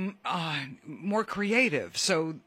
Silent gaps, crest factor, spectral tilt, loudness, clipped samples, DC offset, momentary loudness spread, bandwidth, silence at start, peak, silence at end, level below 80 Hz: none; 20 dB; -3.5 dB/octave; -28 LUFS; under 0.1%; under 0.1%; 10 LU; 16 kHz; 0 s; -10 dBFS; 0.1 s; -70 dBFS